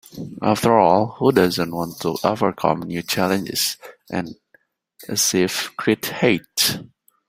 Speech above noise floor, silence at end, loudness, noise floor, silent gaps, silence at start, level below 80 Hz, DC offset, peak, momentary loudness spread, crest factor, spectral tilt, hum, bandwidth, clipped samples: 40 dB; 0.45 s; -20 LUFS; -60 dBFS; none; 0.15 s; -56 dBFS; under 0.1%; -2 dBFS; 12 LU; 20 dB; -4 dB/octave; none; 16 kHz; under 0.1%